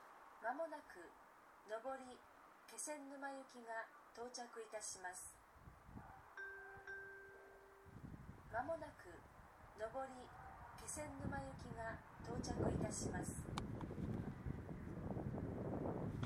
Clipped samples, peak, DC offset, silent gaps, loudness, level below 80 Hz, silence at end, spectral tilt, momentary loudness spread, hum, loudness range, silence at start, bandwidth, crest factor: under 0.1%; -26 dBFS; under 0.1%; none; -50 LUFS; -62 dBFS; 0 s; -5 dB/octave; 16 LU; none; 7 LU; 0 s; 18 kHz; 22 dB